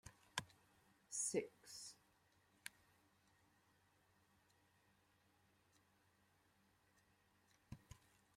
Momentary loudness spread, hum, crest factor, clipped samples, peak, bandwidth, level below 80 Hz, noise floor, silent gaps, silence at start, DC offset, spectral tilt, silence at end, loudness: 24 LU; none; 36 dB; under 0.1%; -20 dBFS; 16 kHz; -82 dBFS; -78 dBFS; none; 0.05 s; under 0.1%; -2.5 dB/octave; 0.4 s; -49 LUFS